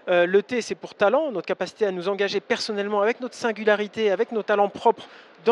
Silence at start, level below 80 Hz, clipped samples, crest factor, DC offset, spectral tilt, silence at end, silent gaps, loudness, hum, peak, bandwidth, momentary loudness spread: 0.05 s; -74 dBFS; under 0.1%; 18 dB; under 0.1%; -4.5 dB/octave; 0 s; none; -24 LUFS; none; -6 dBFS; 11 kHz; 7 LU